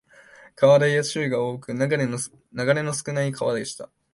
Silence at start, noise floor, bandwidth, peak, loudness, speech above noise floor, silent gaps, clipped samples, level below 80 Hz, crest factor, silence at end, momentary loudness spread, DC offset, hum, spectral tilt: 0.6 s; -50 dBFS; 11.5 kHz; -6 dBFS; -23 LUFS; 28 dB; none; under 0.1%; -64 dBFS; 18 dB; 0.3 s; 13 LU; under 0.1%; none; -5 dB/octave